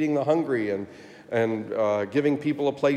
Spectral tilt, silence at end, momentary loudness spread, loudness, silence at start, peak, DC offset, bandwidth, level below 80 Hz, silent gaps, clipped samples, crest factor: -7 dB/octave; 0 s; 6 LU; -25 LUFS; 0 s; -10 dBFS; under 0.1%; 10 kHz; -74 dBFS; none; under 0.1%; 16 dB